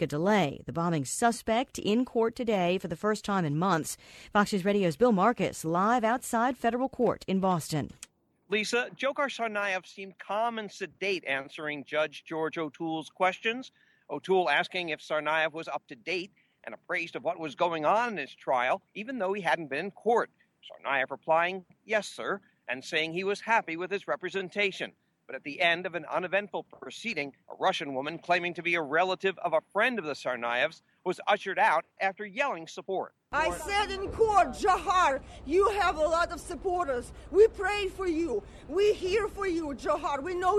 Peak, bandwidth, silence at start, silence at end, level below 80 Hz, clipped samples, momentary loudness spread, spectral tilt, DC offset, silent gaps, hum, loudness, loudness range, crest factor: -10 dBFS; 14 kHz; 0 s; 0 s; -56 dBFS; under 0.1%; 11 LU; -4.5 dB/octave; under 0.1%; none; none; -29 LUFS; 5 LU; 20 dB